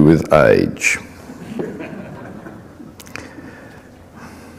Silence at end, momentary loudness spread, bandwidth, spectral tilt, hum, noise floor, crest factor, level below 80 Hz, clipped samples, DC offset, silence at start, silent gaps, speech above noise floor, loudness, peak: 0.3 s; 26 LU; 15.5 kHz; -6 dB/octave; none; -41 dBFS; 18 dB; -42 dBFS; under 0.1%; under 0.1%; 0 s; none; 28 dB; -15 LUFS; 0 dBFS